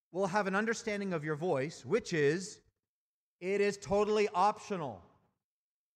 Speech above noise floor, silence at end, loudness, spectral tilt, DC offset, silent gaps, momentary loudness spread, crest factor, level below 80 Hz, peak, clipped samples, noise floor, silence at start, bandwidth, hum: over 57 dB; 0.95 s; -33 LUFS; -5 dB/octave; under 0.1%; 2.88-3.39 s; 10 LU; 18 dB; -68 dBFS; -16 dBFS; under 0.1%; under -90 dBFS; 0.15 s; 10.5 kHz; none